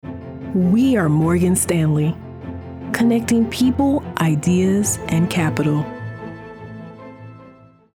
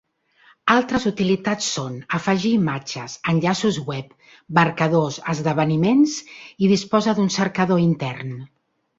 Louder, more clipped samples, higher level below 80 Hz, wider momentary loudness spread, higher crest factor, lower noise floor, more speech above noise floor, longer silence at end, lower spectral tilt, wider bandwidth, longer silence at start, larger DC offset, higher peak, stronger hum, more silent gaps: about the same, -18 LUFS vs -20 LUFS; neither; first, -46 dBFS vs -56 dBFS; first, 19 LU vs 11 LU; about the same, 16 dB vs 18 dB; second, -46 dBFS vs -56 dBFS; second, 29 dB vs 36 dB; about the same, 0.45 s vs 0.55 s; about the same, -6 dB/octave vs -5.5 dB/octave; first, 17 kHz vs 8 kHz; second, 0.05 s vs 0.65 s; neither; about the same, -2 dBFS vs -2 dBFS; neither; neither